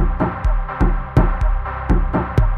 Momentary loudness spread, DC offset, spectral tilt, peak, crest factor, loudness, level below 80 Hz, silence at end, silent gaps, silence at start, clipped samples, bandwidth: 5 LU; under 0.1%; -9 dB/octave; 0 dBFS; 16 dB; -20 LUFS; -18 dBFS; 0 s; none; 0 s; under 0.1%; 4.2 kHz